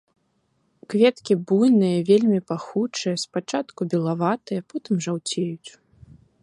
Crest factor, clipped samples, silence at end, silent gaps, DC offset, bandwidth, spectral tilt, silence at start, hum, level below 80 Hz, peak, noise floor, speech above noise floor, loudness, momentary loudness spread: 18 dB; under 0.1%; 0.75 s; none; under 0.1%; 11.5 kHz; -6 dB/octave; 0.9 s; none; -66 dBFS; -6 dBFS; -69 dBFS; 47 dB; -22 LUFS; 10 LU